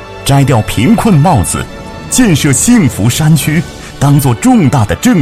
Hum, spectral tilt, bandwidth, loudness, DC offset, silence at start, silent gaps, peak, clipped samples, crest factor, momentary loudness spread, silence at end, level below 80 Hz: none; -5.5 dB/octave; 16 kHz; -9 LUFS; under 0.1%; 0 s; none; 0 dBFS; 0.2%; 8 dB; 8 LU; 0 s; -28 dBFS